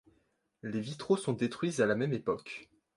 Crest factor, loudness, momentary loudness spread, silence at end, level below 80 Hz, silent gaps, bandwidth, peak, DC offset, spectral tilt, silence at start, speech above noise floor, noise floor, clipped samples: 18 dB; -33 LUFS; 14 LU; 0.3 s; -70 dBFS; none; 11.5 kHz; -16 dBFS; under 0.1%; -6 dB/octave; 0.65 s; 42 dB; -75 dBFS; under 0.1%